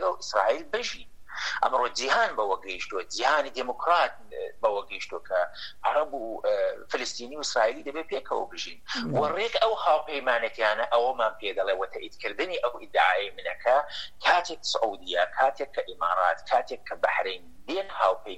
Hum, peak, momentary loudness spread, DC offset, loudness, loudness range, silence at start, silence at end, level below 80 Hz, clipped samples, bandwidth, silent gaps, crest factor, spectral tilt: none; -8 dBFS; 10 LU; 0.7%; -27 LUFS; 3 LU; 0 s; 0 s; -60 dBFS; under 0.1%; 12.5 kHz; none; 20 dB; -2.5 dB/octave